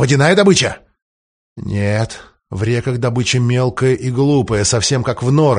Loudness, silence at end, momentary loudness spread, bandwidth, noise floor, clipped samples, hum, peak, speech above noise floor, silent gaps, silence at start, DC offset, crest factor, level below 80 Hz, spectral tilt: -15 LUFS; 0 s; 13 LU; 10 kHz; under -90 dBFS; under 0.1%; none; 0 dBFS; over 76 dB; 1.02-1.56 s; 0 s; under 0.1%; 16 dB; -42 dBFS; -5 dB/octave